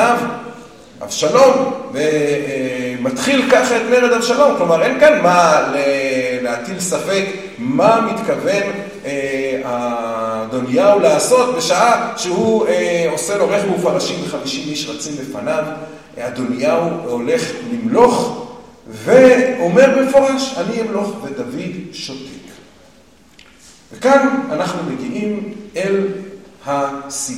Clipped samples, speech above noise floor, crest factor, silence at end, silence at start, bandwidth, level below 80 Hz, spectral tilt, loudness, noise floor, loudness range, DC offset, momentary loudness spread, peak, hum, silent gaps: under 0.1%; 32 dB; 16 dB; 0 s; 0 s; 15.5 kHz; -56 dBFS; -4 dB/octave; -15 LUFS; -48 dBFS; 7 LU; 0.2%; 15 LU; 0 dBFS; none; none